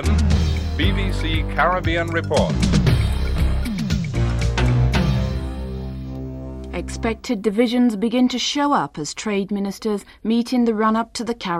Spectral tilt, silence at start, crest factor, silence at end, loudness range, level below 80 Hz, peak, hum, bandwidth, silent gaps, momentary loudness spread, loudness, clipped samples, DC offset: -6 dB/octave; 0 s; 16 dB; 0 s; 3 LU; -26 dBFS; -4 dBFS; none; 15 kHz; none; 11 LU; -21 LUFS; under 0.1%; under 0.1%